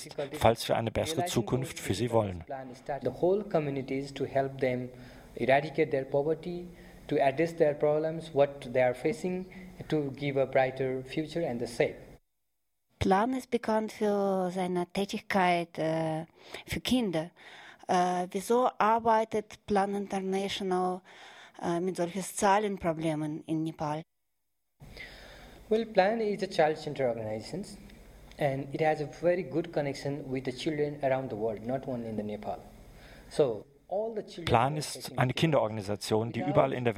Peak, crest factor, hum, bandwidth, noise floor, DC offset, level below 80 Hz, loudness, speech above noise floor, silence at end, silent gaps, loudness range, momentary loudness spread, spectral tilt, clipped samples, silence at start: -8 dBFS; 24 dB; none; 16 kHz; -85 dBFS; under 0.1%; -58 dBFS; -30 LUFS; 55 dB; 0 s; none; 4 LU; 13 LU; -5.5 dB/octave; under 0.1%; 0 s